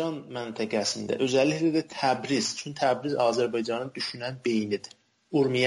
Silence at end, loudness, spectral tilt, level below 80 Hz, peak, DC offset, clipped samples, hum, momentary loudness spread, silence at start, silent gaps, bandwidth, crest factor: 0 s; -28 LUFS; -4.5 dB/octave; -70 dBFS; -12 dBFS; under 0.1%; under 0.1%; none; 9 LU; 0 s; none; 11.5 kHz; 16 dB